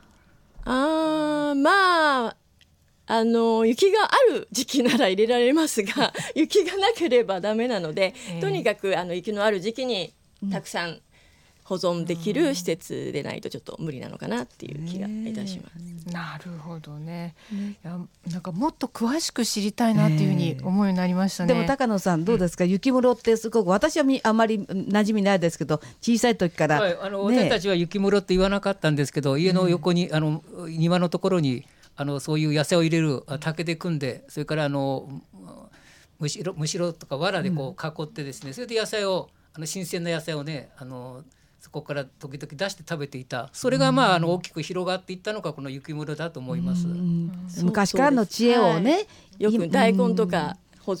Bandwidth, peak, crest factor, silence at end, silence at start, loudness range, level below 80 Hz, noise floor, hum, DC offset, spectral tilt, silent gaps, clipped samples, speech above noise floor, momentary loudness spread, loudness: 17 kHz; -4 dBFS; 20 dB; 0 s; 0.55 s; 11 LU; -54 dBFS; -60 dBFS; none; under 0.1%; -5.5 dB/octave; none; under 0.1%; 36 dB; 15 LU; -24 LUFS